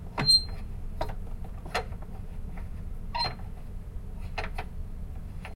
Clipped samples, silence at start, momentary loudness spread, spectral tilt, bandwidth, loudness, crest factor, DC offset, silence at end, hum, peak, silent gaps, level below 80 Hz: under 0.1%; 0 s; 21 LU; -3 dB/octave; 14 kHz; -29 LUFS; 20 dB; under 0.1%; 0 s; none; -12 dBFS; none; -38 dBFS